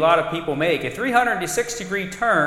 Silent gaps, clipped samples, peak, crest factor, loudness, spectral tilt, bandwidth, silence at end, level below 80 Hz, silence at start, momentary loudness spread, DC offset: none; under 0.1%; -2 dBFS; 18 dB; -21 LUFS; -4 dB/octave; 16.5 kHz; 0 s; -50 dBFS; 0 s; 6 LU; under 0.1%